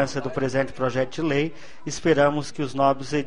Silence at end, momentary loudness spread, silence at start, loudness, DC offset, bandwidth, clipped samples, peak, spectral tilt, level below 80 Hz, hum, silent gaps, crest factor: 0 s; 10 LU; 0 s; -24 LUFS; 2%; 10.5 kHz; under 0.1%; -6 dBFS; -5.5 dB/octave; -52 dBFS; none; none; 18 dB